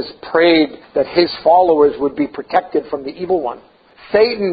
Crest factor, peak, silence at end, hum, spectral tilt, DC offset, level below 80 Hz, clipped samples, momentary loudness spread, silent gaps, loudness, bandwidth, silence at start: 16 dB; 0 dBFS; 0 s; none; -8.5 dB/octave; under 0.1%; -52 dBFS; under 0.1%; 11 LU; none; -15 LUFS; 5 kHz; 0 s